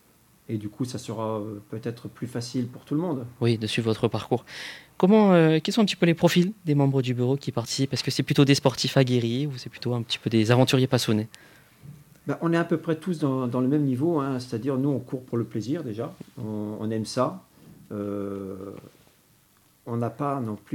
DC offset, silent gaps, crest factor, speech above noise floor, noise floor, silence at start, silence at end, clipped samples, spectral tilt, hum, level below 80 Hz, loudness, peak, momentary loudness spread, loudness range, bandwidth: under 0.1%; none; 20 dB; 36 dB; -61 dBFS; 0.5 s; 0 s; under 0.1%; -6 dB/octave; none; -66 dBFS; -25 LUFS; -4 dBFS; 14 LU; 10 LU; 17 kHz